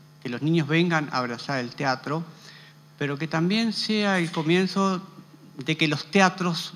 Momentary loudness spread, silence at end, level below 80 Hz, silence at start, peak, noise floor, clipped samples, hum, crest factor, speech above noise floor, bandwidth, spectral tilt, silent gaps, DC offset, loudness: 10 LU; 0 s; -72 dBFS; 0.25 s; -2 dBFS; -49 dBFS; under 0.1%; none; 22 dB; 25 dB; 13 kHz; -5.5 dB/octave; none; under 0.1%; -25 LUFS